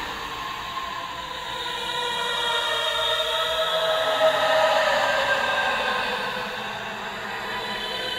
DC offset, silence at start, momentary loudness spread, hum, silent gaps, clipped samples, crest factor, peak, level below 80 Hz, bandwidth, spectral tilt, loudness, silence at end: under 0.1%; 0 s; 11 LU; none; none; under 0.1%; 16 dB; -8 dBFS; -54 dBFS; 16 kHz; -1.5 dB/octave; -24 LUFS; 0 s